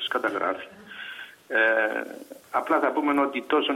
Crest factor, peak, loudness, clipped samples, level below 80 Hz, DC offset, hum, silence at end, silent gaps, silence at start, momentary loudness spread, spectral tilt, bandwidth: 16 dB; -10 dBFS; -25 LUFS; under 0.1%; -72 dBFS; under 0.1%; none; 0 s; none; 0 s; 18 LU; -3.5 dB/octave; 16 kHz